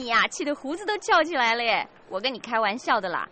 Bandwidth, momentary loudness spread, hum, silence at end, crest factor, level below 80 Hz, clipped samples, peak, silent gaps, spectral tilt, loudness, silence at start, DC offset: 8.8 kHz; 8 LU; none; 0.05 s; 16 dB; -64 dBFS; under 0.1%; -10 dBFS; none; -2 dB/octave; -24 LUFS; 0 s; under 0.1%